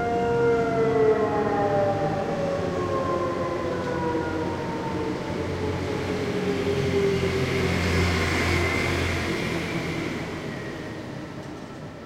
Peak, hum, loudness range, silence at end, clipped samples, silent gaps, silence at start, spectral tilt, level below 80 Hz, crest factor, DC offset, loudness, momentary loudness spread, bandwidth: -10 dBFS; none; 4 LU; 0 s; under 0.1%; none; 0 s; -6 dB/octave; -44 dBFS; 14 dB; under 0.1%; -25 LUFS; 11 LU; 16 kHz